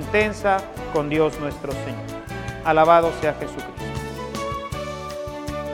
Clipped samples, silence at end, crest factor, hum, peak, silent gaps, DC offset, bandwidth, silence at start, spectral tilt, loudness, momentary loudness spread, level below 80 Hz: under 0.1%; 0 s; 20 dB; none; -2 dBFS; none; under 0.1%; 17.5 kHz; 0 s; -5.5 dB/octave; -23 LUFS; 15 LU; -42 dBFS